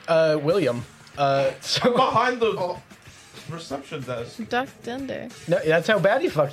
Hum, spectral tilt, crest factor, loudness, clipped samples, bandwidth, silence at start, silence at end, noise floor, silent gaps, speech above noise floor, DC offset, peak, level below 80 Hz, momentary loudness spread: none; -5 dB/octave; 16 dB; -23 LUFS; under 0.1%; 15.5 kHz; 0.05 s; 0 s; -45 dBFS; none; 22 dB; under 0.1%; -6 dBFS; -60 dBFS; 14 LU